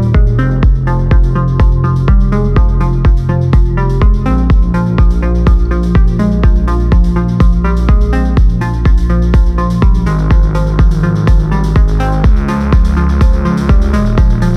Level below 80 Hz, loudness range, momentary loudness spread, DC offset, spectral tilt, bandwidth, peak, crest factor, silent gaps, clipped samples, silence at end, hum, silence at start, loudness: -10 dBFS; 0 LU; 2 LU; under 0.1%; -8.5 dB/octave; 6.4 kHz; 0 dBFS; 8 dB; none; under 0.1%; 0 s; none; 0 s; -11 LUFS